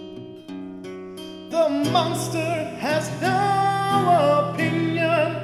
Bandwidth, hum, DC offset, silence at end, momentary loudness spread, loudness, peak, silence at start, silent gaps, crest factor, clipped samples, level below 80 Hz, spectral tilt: 16 kHz; none; under 0.1%; 0 s; 18 LU; -21 LUFS; -6 dBFS; 0 s; none; 16 dB; under 0.1%; -62 dBFS; -5.5 dB/octave